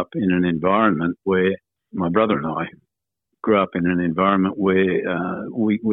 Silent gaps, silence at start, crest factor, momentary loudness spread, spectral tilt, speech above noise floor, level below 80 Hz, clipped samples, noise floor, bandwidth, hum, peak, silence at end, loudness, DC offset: none; 0 s; 16 dB; 8 LU; -11 dB/octave; 59 dB; -58 dBFS; under 0.1%; -79 dBFS; 4 kHz; none; -4 dBFS; 0 s; -20 LUFS; under 0.1%